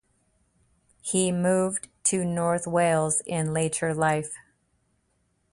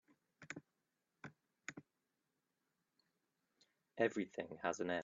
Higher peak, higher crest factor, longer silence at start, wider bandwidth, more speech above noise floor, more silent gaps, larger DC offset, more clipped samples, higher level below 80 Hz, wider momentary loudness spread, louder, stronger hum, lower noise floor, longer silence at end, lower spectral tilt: first, -10 dBFS vs -22 dBFS; second, 18 dB vs 26 dB; first, 1.05 s vs 0.4 s; first, 11.5 kHz vs 7.4 kHz; about the same, 46 dB vs 48 dB; neither; neither; neither; first, -62 dBFS vs -88 dBFS; second, 6 LU vs 20 LU; first, -25 LUFS vs -44 LUFS; neither; second, -71 dBFS vs -88 dBFS; first, 1.15 s vs 0 s; about the same, -4.5 dB/octave vs -4 dB/octave